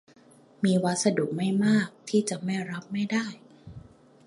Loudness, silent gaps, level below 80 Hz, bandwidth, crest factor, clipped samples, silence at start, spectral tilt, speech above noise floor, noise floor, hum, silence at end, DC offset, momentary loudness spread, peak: -27 LUFS; none; -64 dBFS; 11.5 kHz; 18 dB; under 0.1%; 0.6 s; -5.5 dB/octave; 23 dB; -49 dBFS; none; 0.45 s; under 0.1%; 21 LU; -10 dBFS